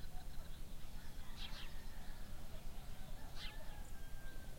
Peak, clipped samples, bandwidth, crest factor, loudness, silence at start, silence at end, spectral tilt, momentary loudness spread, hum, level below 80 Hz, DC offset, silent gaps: -32 dBFS; under 0.1%; 16.5 kHz; 12 dB; -54 LUFS; 0 s; 0 s; -4 dB/octave; 5 LU; none; -50 dBFS; under 0.1%; none